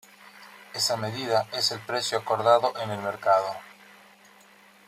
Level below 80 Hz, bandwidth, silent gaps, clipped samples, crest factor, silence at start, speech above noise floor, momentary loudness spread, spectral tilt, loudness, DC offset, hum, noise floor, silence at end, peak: -74 dBFS; 16 kHz; none; under 0.1%; 22 dB; 0.25 s; 29 dB; 15 LU; -3 dB/octave; -25 LUFS; under 0.1%; none; -55 dBFS; 1.15 s; -6 dBFS